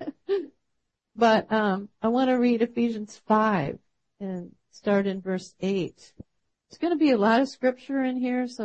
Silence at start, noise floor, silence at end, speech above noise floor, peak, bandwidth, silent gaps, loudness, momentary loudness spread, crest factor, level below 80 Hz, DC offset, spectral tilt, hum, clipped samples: 0 s; -79 dBFS; 0 s; 54 dB; -8 dBFS; 8.6 kHz; none; -25 LUFS; 14 LU; 18 dB; -66 dBFS; under 0.1%; -6.5 dB/octave; none; under 0.1%